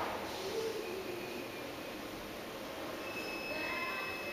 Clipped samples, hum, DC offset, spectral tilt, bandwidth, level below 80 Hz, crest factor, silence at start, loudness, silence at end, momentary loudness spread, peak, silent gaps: under 0.1%; none; under 0.1%; -3.5 dB/octave; 15.5 kHz; -66 dBFS; 16 dB; 0 s; -40 LUFS; 0 s; 7 LU; -26 dBFS; none